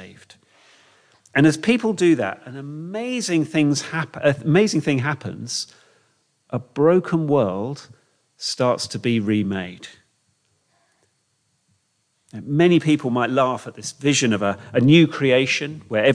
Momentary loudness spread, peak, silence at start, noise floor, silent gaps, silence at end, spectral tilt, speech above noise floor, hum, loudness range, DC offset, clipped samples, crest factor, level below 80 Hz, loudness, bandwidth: 14 LU; -4 dBFS; 0 s; -69 dBFS; none; 0 s; -5.5 dB/octave; 49 dB; none; 7 LU; under 0.1%; under 0.1%; 18 dB; -66 dBFS; -20 LUFS; 10.5 kHz